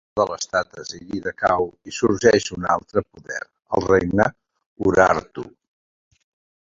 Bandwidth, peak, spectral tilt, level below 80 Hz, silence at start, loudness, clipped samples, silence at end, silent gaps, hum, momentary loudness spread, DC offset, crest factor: 7.8 kHz; -2 dBFS; -5 dB/octave; -48 dBFS; 0.15 s; -21 LUFS; under 0.1%; 1.15 s; 4.66-4.76 s; none; 15 LU; under 0.1%; 20 dB